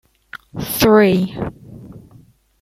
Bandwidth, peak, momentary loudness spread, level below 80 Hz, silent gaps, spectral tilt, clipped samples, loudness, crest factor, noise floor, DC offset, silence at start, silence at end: 16 kHz; -2 dBFS; 26 LU; -44 dBFS; none; -5.5 dB/octave; under 0.1%; -15 LUFS; 18 dB; -48 dBFS; under 0.1%; 0.35 s; 0.65 s